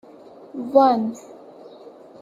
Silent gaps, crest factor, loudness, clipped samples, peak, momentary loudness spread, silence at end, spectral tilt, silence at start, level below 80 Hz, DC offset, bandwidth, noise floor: none; 20 dB; -19 LUFS; under 0.1%; -2 dBFS; 21 LU; 0.3 s; -6.5 dB/octave; 0.4 s; -70 dBFS; under 0.1%; 7.6 kHz; -45 dBFS